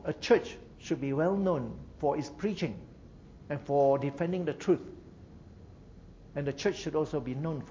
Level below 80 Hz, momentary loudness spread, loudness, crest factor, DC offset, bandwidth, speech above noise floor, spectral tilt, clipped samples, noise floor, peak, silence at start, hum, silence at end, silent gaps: -56 dBFS; 20 LU; -31 LUFS; 20 dB; under 0.1%; 7.6 kHz; 21 dB; -6.5 dB/octave; under 0.1%; -52 dBFS; -12 dBFS; 0 s; none; 0 s; none